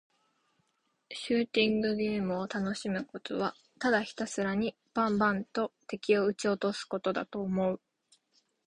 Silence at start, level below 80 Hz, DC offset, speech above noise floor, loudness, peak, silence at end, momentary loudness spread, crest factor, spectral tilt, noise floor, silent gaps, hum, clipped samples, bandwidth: 1.1 s; -66 dBFS; under 0.1%; 46 dB; -32 LUFS; -14 dBFS; 0.9 s; 9 LU; 18 dB; -5 dB/octave; -77 dBFS; none; none; under 0.1%; 11 kHz